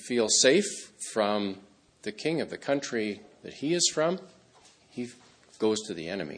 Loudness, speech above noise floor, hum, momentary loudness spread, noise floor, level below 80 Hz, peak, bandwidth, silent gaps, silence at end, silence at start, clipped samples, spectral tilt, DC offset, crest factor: -28 LUFS; 30 dB; none; 19 LU; -59 dBFS; -72 dBFS; -8 dBFS; 10.5 kHz; none; 0 s; 0 s; under 0.1%; -2.5 dB/octave; under 0.1%; 22 dB